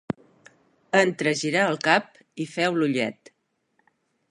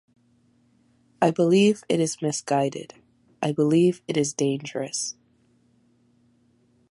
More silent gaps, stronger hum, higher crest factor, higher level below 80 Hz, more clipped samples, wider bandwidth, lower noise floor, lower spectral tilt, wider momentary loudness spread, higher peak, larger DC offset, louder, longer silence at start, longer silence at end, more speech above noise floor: neither; neither; about the same, 24 dB vs 20 dB; about the same, -70 dBFS vs -70 dBFS; neither; about the same, 11.5 kHz vs 11.5 kHz; first, -71 dBFS vs -63 dBFS; about the same, -4.5 dB/octave vs -5 dB/octave; first, 14 LU vs 11 LU; about the same, -2 dBFS vs -4 dBFS; neither; about the same, -23 LUFS vs -23 LUFS; second, 0.1 s vs 1.2 s; second, 1.2 s vs 1.8 s; first, 48 dB vs 40 dB